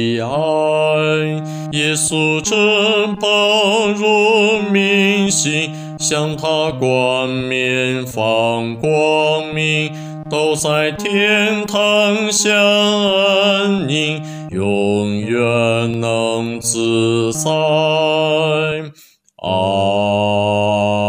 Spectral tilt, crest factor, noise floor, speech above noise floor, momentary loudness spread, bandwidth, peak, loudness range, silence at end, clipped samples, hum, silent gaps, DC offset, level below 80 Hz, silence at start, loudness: -4 dB/octave; 14 dB; -47 dBFS; 31 dB; 7 LU; 16 kHz; -2 dBFS; 3 LU; 0 s; under 0.1%; none; none; under 0.1%; -54 dBFS; 0 s; -15 LUFS